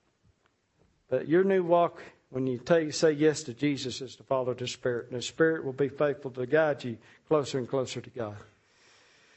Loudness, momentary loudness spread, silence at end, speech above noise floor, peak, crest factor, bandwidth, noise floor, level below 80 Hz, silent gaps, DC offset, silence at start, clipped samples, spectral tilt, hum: -29 LUFS; 14 LU; 0.95 s; 43 dB; -10 dBFS; 18 dB; 8.4 kHz; -71 dBFS; -70 dBFS; none; under 0.1%; 1.1 s; under 0.1%; -5.5 dB/octave; none